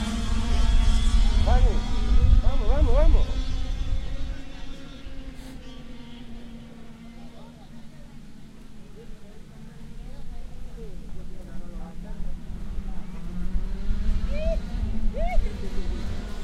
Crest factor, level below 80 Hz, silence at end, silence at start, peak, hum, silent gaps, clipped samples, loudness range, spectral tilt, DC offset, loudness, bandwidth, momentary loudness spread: 16 dB; -24 dBFS; 0 s; 0 s; -6 dBFS; none; none; under 0.1%; 21 LU; -6.5 dB/octave; under 0.1%; -28 LUFS; 9.6 kHz; 23 LU